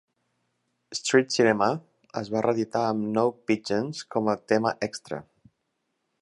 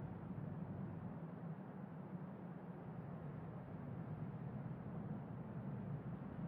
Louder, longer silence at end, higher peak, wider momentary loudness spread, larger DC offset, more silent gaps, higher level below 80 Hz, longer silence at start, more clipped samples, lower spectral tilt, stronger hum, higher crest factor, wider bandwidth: first, -26 LUFS vs -50 LUFS; first, 1 s vs 0 s; first, -6 dBFS vs -36 dBFS; first, 14 LU vs 3 LU; neither; neither; about the same, -68 dBFS vs -70 dBFS; first, 0.9 s vs 0 s; neither; second, -4.5 dB/octave vs -10 dB/octave; neither; first, 20 dB vs 14 dB; first, 11.5 kHz vs 4.1 kHz